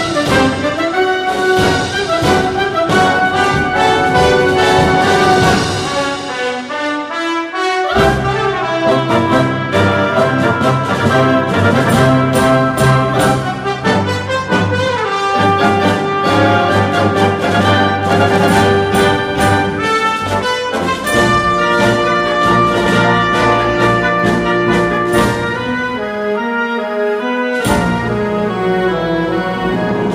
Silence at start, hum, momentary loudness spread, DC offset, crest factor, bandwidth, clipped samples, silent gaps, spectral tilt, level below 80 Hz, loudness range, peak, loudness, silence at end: 0 s; none; 6 LU; under 0.1%; 12 dB; 15 kHz; under 0.1%; none; -5.5 dB/octave; -36 dBFS; 4 LU; 0 dBFS; -13 LUFS; 0 s